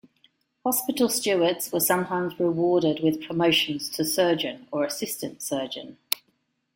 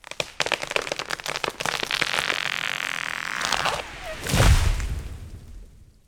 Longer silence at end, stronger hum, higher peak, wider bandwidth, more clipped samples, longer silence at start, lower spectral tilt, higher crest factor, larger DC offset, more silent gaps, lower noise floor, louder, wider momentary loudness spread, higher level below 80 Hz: first, 0.6 s vs 0.25 s; neither; about the same, 0 dBFS vs -2 dBFS; second, 16.5 kHz vs 19 kHz; neither; first, 0.65 s vs 0.1 s; about the same, -3.5 dB/octave vs -3 dB/octave; about the same, 26 dB vs 24 dB; neither; neither; first, -72 dBFS vs -46 dBFS; about the same, -25 LUFS vs -25 LUFS; second, 8 LU vs 14 LU; second, -68 dBFS vs -32 dBFS